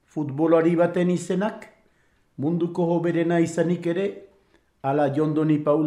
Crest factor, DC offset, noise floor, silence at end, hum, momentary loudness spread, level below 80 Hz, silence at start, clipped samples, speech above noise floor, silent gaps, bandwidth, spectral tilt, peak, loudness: 16 dB; under 0.1%; -63 dBFS; 0 s; none; 10 LU; -68 dBFS; 0.15 s; under 0.1%; 41 dB; none; 11 kHz; -7.5 dB/octave; -8 dBFS; -23 LUFS